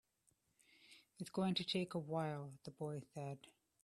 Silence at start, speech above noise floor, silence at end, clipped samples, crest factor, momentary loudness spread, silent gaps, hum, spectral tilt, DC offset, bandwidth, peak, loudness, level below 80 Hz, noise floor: 0.8 s; 37 dB; 0.4 s; under 0.1%; 20 dB; 19 LU; none; none; -6 dB/octave; under 0.1%; 12.5 kHz; -26 dBFS; -44 LUFS; -82 dBFS; -81 dBFS